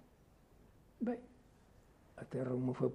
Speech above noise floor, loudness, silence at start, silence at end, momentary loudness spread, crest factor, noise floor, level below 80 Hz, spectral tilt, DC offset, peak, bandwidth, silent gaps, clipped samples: 28 dB; -41 LUFS; 1 s; 0 s; 21 LU; 20 dB; -66 dBFS; -70 dBFS; -9.5 dB/octave; under 0.1%; -22 dBFS; 10.5 kHz; none; under 0.1%